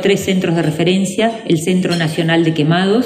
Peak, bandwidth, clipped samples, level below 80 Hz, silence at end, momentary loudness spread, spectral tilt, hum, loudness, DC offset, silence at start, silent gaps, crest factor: -2 dBFS; 15 kHz; under 0.1%; -56 dBFS; 0 s; 3 LU; -5.5 dB/octave; none; -15 LUFS; under 0.1%; 0 s; none; 12 dB